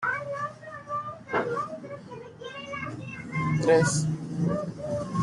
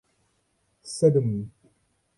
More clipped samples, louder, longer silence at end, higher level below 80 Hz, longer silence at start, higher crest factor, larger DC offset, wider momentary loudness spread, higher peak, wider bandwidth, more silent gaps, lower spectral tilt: neither; second, -29 LUFS vs -24 LUFS; second, 0 s vs 0.7 s; about the same, -60 dBFS vs -62 dBFS; second, 0 s vs 0.85 s; about the same, 18 dB vs 20 dB; neither; second, 18 LU vs 21 LU; second, -10 dBFS vs -6 dBFS; about the same, 11.5 kHz vs 11.5 kHz; neither; second, -5.5 dB/octave vs -7.5 dB/octave